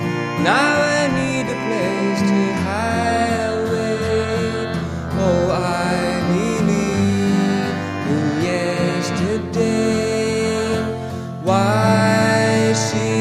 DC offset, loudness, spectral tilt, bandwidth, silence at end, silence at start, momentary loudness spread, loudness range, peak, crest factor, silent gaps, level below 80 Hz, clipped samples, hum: under 0.1%; -18 LUFS; -5.5 dB/octave; 14 kHz; 0 s; 0 s; 6 LU; 2 LU; -2 dBFS; 16 dB; none; -42 dBFS; under 0.1%; none